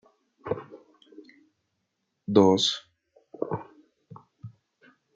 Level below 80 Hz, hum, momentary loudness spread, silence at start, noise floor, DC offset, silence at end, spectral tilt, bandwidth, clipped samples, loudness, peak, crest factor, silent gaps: -72 dBFS; none; 28 LU; 0.45 s; -79 dBFS; under 0.1%; 0.65 s; -5 dB/octave; 9.2 kHz; under 0.1%; -26 LUFS; -4 dBFS; 26 dB; none